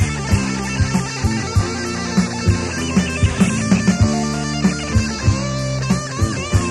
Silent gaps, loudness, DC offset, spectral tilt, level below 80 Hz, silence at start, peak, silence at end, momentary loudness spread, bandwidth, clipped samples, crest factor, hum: none; -19 LUFS; 0.2%; -5 dB/octave; -28 dBFS; 0 s; -2 dBFS; 0 s; 5 LU; 12.5 kHz; under 0.1%; 16 dB; none